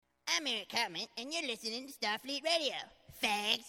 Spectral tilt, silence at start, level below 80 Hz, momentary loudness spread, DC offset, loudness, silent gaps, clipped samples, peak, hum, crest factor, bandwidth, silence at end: -1 dB/octave; 0.25 s; -74 dBFS; 8 LU; under 0.1%; -35 LUFS; none; under 0.1%; -16 dBFS; none; 22 dB; 17 kHz; 0 s